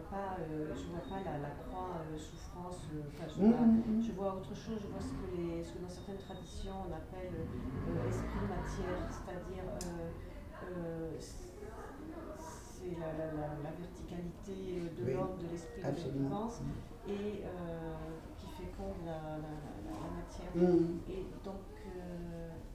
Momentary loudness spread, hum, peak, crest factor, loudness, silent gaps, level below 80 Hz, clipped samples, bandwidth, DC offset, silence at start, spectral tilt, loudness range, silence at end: 14 LU; none; -18 dBFS; 22 dB; -40 LUFS; none; -52 dBFS; under 0.1%; 15.5 kHz; under 0.1%; 0 s; -7.5 dB/octave; 10 LU; 0 s